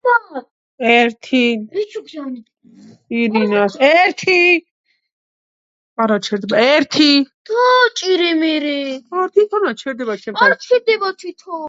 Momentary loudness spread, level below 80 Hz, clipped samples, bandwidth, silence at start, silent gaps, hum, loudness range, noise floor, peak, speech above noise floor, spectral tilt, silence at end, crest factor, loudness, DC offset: 15 LU; -70 dBFS; under 0.1%; 7.8 kHz; 0.05 s; 0.51-0.78 s, 4.71-4.84 s, 5.12-5.96 s, 7.34-7.45 s; none; 3 LU; -44 dBFS; 0 dBFS; 29 dB; -4 dB/octave; 0 s; 16 dB; -15 LUFS; under 0.1%